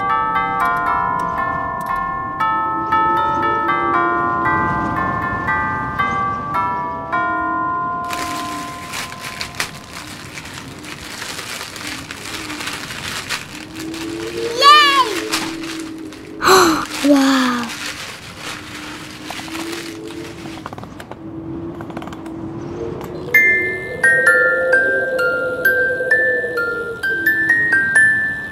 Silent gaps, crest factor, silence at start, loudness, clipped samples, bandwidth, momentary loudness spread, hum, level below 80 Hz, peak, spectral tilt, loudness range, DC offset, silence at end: none; 18 dB; 0 s; -17 LUFS; under 0.1%; 16 kHz; 18 LU; none; -46 dBFS; 0 dBFS; -3 dB/octave; 14 LU; under 0.1%; 0 s